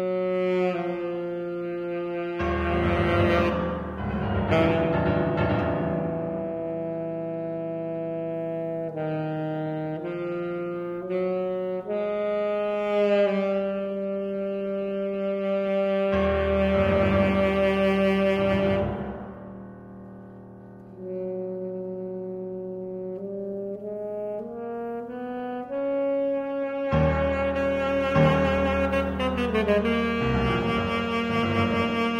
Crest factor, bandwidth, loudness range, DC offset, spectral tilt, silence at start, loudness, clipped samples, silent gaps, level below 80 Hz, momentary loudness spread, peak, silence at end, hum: 18 dB; 10 kHz; 10 LU; under 0.1%; -8 dB/octave; 0 s; -26 LUFS; under 0.1%; none; -42 dBFS; 12 LU; -8 dBFS; 0 s; none